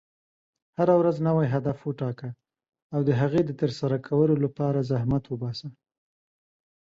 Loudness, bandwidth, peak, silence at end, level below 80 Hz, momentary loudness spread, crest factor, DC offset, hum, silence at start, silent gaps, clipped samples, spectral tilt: -26 LUFS; 7.6 kHz; -10 dBFS; 1.15 s; -58 dBFS; 12 LU; 18 dB; under 0.1%; none; 0.8 s; 2.82-2.90 s; under 0.1%; -9 dB/octave